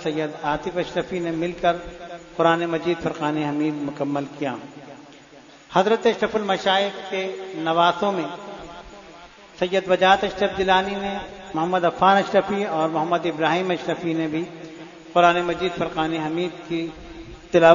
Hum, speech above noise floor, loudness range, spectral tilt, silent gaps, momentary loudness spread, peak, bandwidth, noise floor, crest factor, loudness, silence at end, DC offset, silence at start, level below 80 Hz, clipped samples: none; 25 dB; 4 LU; -5.5 dB/octave; none; 18 LU; 0 dBFS; 7.4 kHz; -47 dBFS; 22 dB; -22 LUFS; 0 s; under 0.1%; 0 s; -52 dBFS; under 0.1%